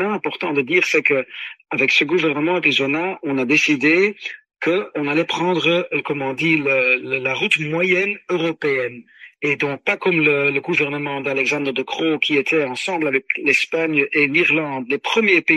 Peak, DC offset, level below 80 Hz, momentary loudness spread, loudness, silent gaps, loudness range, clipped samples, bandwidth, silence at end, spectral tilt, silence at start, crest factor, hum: -2 dBFS; under 0.1%; -68 dBFS; 8 LU; -18 LUFS; none; 2 LU; under 0.1%; 12.5 kHz; 0 s; -4.5 dB/octave; 0 s; 18 dB; none